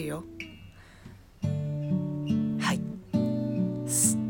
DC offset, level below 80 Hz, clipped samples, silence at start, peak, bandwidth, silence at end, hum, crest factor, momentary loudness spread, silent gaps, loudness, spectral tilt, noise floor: under 0.1%; -58 dBFS; under 0.1%; 0 s; -10 dBFS; 17.5 kHz; 0 s; none; 20 dB; 16 LU; none; -29 LUFS; -5 dB/octave; -50 dBFS